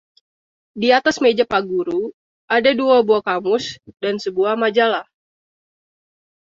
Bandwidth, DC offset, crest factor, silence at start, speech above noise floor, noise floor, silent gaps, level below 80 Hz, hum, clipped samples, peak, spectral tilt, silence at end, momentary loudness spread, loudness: 7.6 kHz; under 0.1%; 18 dB; 0.75 s; over 73 dB; under -90 dBFS; 2.14-2.48 s; -62 dBFS; none; under 0.1%; -2 dBFS; -4 dB/octave; 1.5 s; 11 LU; -18 LUFS